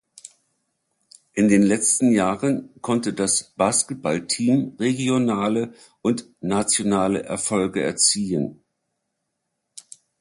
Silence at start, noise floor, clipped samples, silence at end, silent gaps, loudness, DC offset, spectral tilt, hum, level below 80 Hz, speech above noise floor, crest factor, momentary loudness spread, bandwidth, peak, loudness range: 0.25 s; -78 dBFS; under 0.1%; 1.65 s; none; -21 LUFS; under 0.1%; -4 dB/octave; none; -58 dBFS; 56 dB; 18 dB; 9 LU; 11.5 kHz; -4 dBFS; 2 LU